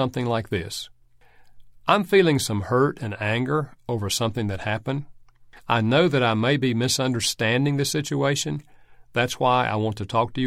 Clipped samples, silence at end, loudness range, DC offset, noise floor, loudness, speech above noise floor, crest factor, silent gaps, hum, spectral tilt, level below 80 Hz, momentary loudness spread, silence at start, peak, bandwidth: under 0.1%; 0 s; 3 LU; under 0.1%; -52 dBFS; -23 LUFS; 30 dB; 20 dB; none; none; -5 dB/octave; -54 dBFS; 11 LU; 0 s; -4 dBFS; 16.5 kHz